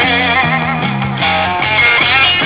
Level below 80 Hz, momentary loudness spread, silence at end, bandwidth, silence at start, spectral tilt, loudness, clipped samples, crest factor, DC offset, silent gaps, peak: -36 dBFS; 8 LU; 0 s; 4 kHz; 0 s; -7.5 dB/octave; -11 LUFS; under 0.1%; 12 dB; under 0.1%; none; 0 dBFS